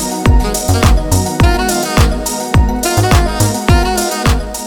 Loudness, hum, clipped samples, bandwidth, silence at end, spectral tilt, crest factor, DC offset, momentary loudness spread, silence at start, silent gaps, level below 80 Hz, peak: -13 LUFS; none; under 0.1%; 20 kHz; 0 s; -4.5 dB/octave; 12 dB; under 0.1%; 3 LU; 0 s; none; -16 dBFS; 0 dBFS